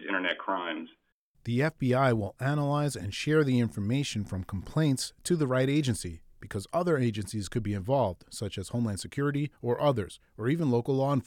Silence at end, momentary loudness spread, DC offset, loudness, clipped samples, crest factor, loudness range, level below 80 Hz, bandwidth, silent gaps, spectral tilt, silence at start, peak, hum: 0.05 s; 10 LU; under 0.1%; -30 LUFS; under 0.1%; 16 dB; 3 LU; -56 dBFS; 16.5 kHz; 1.12-1.34 s; -6 dB/octave; 0 s; -12 dBFS; none